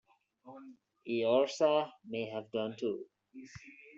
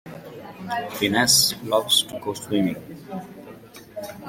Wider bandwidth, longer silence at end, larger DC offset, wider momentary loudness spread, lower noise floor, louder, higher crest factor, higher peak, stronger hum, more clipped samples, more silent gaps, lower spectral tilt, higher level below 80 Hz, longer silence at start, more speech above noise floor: second, 7.8 kHz vs 16.5 kHz; about the same, 0.05 s vs 0 s; neither; about the same, 23 LU vs 24 LU; first, -58 dBFS vs -43 dBFS; second, -34 LUFS vs -20 LUFS; about the same, 20 dB vs 20 dB; second, -16 dBFS vs -4 dBFS; neither; neither; neither; first, -3.5 dB/octave vs -2 dB/octave; second, -78 dBFS vs -60 dBFS; first, 0.45 s vs 0.05 s; first, 24 dB vs 20 dB